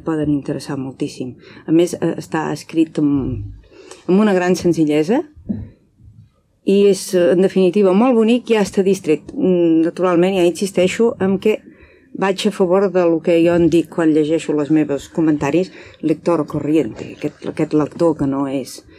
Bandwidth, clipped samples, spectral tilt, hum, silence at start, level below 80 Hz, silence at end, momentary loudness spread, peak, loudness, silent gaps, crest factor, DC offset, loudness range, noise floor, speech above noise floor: 14.5 kHz; under 0.1%; -6.5 dB/octave; none; 0.05 s; -48 dBFS; 0.2 s; 12 LU; -4 dBFS; -17 LUFS; none; 12 dB; under 0.1%; 5 LU; -49 dBFS; 33 dB